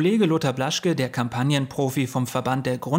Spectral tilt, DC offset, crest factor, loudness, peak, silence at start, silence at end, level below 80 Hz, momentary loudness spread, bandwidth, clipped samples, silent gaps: -5.5 dB/octave; under 0.1%; 14 dB; -23 LUFS; -8 dBFS; 0 s; 0 s; -60 dBFS; 4 LU; 16 kHz; under 0.1%; none